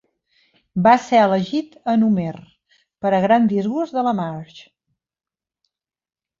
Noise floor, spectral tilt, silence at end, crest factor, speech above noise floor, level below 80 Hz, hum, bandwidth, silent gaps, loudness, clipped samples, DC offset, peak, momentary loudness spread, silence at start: under -90 dBFS; -7 dB/octave; 1.8 s; 18 dB; over 72 dB; -62 dBFS; none; 7.4 kHz; none; -18 LUFS; under 0.1%; under 0.1%; -2 dBFS; 14 LU; 0.75 s